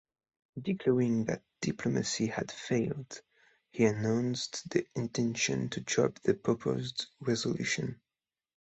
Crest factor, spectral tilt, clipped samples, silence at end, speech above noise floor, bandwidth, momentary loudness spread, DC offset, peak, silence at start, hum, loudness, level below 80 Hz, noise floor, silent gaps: 20 dB; -5 dB/octave; under 0.1%; 0.8 s; over 58 dB; 8.2 kHz; 9 LU; under 0.1%; -12 dBFS; 0.55 s; none; -32 LUFS; -66 dBFS; under -90 dBFS; none